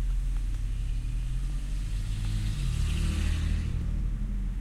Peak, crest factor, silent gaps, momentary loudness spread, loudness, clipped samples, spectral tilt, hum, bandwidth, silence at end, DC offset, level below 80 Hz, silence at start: -18 dBFS; 12 dB; none; 5 LU; -33 LUFS; under 0.1%; -5.5 dB/octave; none; 12 kHz; 0 s; under 0.1%; -30 dBFS; 0 s